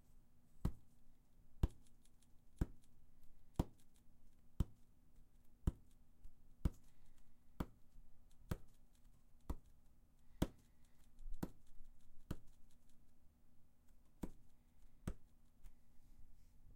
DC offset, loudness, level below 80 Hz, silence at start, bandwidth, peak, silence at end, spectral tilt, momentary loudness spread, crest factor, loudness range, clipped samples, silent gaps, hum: under 0.1%; -50 LUFS; -54 dBFS; 0.05 s; 16 kHz; -22 dBFS; 0 s; -7 dB/octave; 11 LU; 28 dB; 9 LU; under 0.1%; none; none